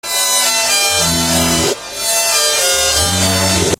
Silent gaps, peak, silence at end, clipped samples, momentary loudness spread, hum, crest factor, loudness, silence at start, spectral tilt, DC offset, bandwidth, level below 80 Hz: none; 0 dBFS; 0.05 s; under 0.1%; 3 LU; none; 14 dB; -12 LUFS; 0.05 s; -1.5 dB/octave; under 0.1%; 16 kHz; -34 dBFS